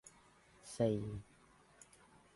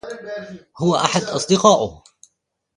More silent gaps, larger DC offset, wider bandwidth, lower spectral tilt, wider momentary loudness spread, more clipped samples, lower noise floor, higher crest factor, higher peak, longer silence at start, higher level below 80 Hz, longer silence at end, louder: neither; neither; about the same, 11.5 kHz vs 11.5 kHz; first, -7 dB/octave vs -4.5 dB/octave; first, 25 LU vs 18 LU; neither; second, -67 dBFS vs -71 dBFS; about the same, 22 dB vs 20 dB; second, -22 dBFS vs 0 dBFS; about the same, 0.05 s vs 0.05 s; second, -66 dBFS vs -54 dBFS; first, 1.15 s vs 0.8 s; second, -40 LUFS vs -18 LUFS